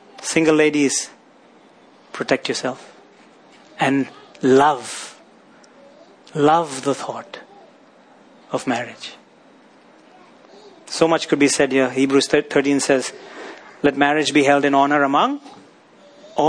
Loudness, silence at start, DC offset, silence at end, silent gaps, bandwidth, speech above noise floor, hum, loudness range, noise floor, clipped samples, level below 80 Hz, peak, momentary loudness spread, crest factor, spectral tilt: -18 LUFS; 0.2 s; under 0.1%; 0 s; none; 10.5 kHz; 32 dB; none; 11 LU; -50 dBFS; under 0.1%; -62 dBFS; 0 dBFS; 19 LU; 20 dB; -4 dB/octave